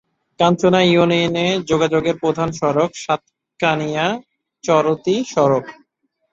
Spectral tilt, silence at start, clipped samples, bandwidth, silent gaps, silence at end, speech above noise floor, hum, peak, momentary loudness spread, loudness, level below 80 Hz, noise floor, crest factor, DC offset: -5.5 dB/octave; 0.4 s; under 0.1%; 7.8 kHz; none; 0.6 s; 52 dB; none; -2 dBFS; 9 LU; -17 LUFS; -54 dBFS; -69 dBFS; 16 dB; under 0.1%